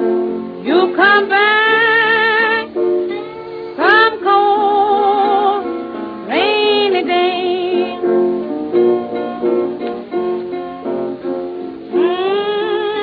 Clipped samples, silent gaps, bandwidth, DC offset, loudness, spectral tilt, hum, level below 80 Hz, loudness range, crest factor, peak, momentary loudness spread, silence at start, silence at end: under 0.1%; none; 5.2 kHz; under 0.1%; -14 LUFS; -6.5 dB/octave; none; -58 dBFS; 7 LU; 14 dB; 0 dBFS; 13 LU; 0 s; 0 s